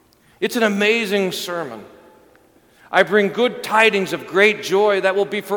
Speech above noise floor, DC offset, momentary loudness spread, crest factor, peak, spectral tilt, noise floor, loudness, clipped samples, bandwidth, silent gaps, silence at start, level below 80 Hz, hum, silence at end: 35 dB; under 0.1%; 11 LU; 20 dB; 0 dBFS; -4 dB/octave; -53 dBFS; -18 LUFS; under 0.1%; 19 kHz; none; 0.4 s; -66 dBFS; none; 0 s